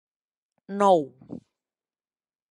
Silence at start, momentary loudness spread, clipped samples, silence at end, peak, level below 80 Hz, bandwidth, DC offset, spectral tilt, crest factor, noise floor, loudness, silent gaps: 0.7 s; 23 LU; under 0.1%; 1.1 s; -6 dBFS; -78 dBFS; 11 kHz; under 0.1%; -6.5 dB/octave; 22 dB; under -90 dBFS; -22 LUFS; none